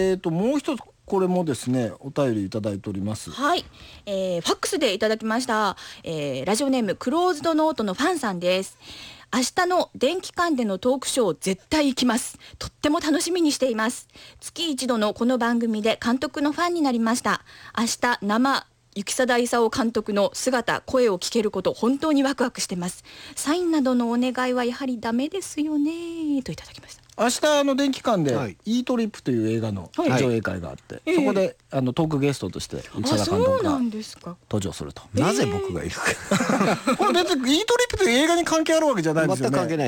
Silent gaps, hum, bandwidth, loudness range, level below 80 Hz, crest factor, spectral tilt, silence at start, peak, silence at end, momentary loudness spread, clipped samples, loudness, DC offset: none; none; 19 kHz; 3 LU; -54 dBFS; 14 dB; -4.5 dB/octave; 0 s; -8 dBFS; 0 s; 10 LU; under 0.1%; -23 LUFS; under 0.1%